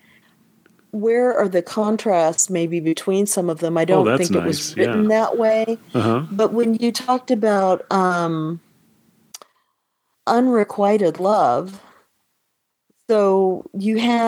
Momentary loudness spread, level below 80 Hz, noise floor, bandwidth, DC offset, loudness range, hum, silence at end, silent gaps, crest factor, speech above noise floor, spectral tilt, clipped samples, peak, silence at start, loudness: 6 LU; -66 dBFS; -74 dBFS; 16.5 kHz; under 0.1%; 3 LU; none; 0 s; none; 18 dB; 56 dB; -5 dB/octave; under 0.1%; -2 dBFS; 0.95 s; -19 LUFS